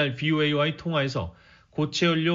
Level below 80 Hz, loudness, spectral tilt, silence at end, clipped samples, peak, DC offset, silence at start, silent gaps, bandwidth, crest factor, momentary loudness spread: -54 dBFS; -25 LUFS; -4 dB/octave; 0 s; under 0.1%; -10 dBFS; under 0.1%; 0 s; none; 7.4 kHz; 16 dB; 11 LU